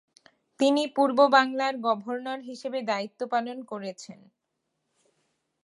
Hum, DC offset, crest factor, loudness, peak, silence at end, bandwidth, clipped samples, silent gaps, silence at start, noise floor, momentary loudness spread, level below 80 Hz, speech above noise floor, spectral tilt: none; under 0.1%; 22 dB; -26 LUFS; -6 dBFS; 1.5 s; 11.5 kHz; under 0.1%; none; 0.6 s; -80 dBFS; 17 LU; -84 dBFS; 54 dB; -4 dB/octave